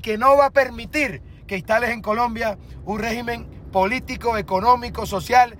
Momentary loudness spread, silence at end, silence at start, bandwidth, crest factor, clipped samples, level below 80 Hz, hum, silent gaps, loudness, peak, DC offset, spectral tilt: 14 LU; 0 s; 0 s; 16.5 kHz; 16 dB; under 0.1%; -40 dBFS; none; none; -21 LUFS; -4 dBFS; under 0.1%; -5 dB/octave